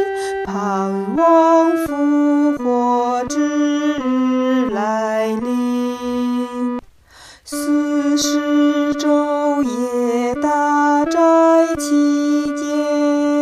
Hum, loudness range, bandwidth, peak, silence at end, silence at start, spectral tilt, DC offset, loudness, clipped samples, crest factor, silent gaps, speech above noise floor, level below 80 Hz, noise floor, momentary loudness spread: none; 5 LU; 13.5 kHz; -2 dBFS; 0 s; 0 s; -4.5 dB/octave; under 0.1%; -17 LUFS; under 0.1%; 14 dB; none; 29 dB; -52 dBFS; -44 dBFS; 8 LU